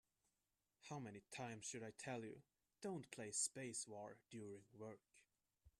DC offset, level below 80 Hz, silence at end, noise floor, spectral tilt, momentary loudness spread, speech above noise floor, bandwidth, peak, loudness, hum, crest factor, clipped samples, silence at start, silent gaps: under 0.1%; -86 dBFS; 0.1 s; under -90 dBFS; -3 dB/octave; 15 LU; over 38 dB; 13 kHz; -30 dBFS; -51 LUFS; none; 24 dB; under 0.1%; 0.8 s; none